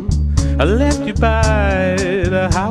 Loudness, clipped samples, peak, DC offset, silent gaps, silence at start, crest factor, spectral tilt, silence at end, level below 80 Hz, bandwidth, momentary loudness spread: -16 LUFS; under 0.1%; 0 dBFS; under 0.1%; none; 0 s; 14 dB; -6 dB/octave; 0 s; -20 dBFS; 11 kHz; 3 LU